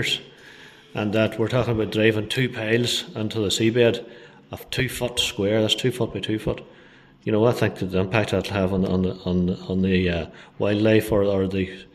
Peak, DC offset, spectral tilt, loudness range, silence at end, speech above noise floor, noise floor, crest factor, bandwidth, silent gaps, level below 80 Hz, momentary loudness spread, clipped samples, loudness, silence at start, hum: -4 dBFS; under 0.1%; -5.5 dB/octave; 2 LU; 0.1 s; 28 dB; -50 dBFS; 20 dB; 14 kHz; none; -48 dBFS; 9 LU; under 0.1%; -23 LUFS; 0 s; none